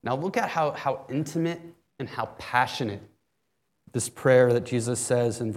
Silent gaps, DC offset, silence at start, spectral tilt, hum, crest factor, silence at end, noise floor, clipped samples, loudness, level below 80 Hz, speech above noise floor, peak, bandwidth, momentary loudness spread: none; under 0.1%; 0.05 s; -5 dB/octave; none; 20 dB; 0 s; -77 dBFS; under 0.1%; -26 LUFS; -68 dBFS; 52 dB; -6 dBFS; 15.5 kHz; 14 LU